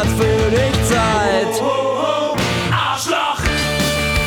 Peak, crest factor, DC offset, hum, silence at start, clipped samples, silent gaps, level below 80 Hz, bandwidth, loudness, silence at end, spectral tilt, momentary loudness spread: -4 dBFS; 12 dB; under 0.1%; none; 0 s; under 0.1%; none; -28 dBFS; over 20 kHz; -16 LUFS; 0 s; -4.5 dB/octave; 3 LU